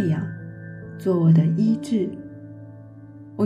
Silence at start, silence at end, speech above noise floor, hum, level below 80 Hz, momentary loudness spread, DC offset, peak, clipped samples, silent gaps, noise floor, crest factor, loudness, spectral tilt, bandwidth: 0 s; 0 s; 22 dB; none; -62 dBFS; 25 LU; under 0.1%; -6 dBFS; under 0.1%; none; -42 dBFS; 16 dB; -21 LUFS; -9.5 dB/octave; 9.8 kHz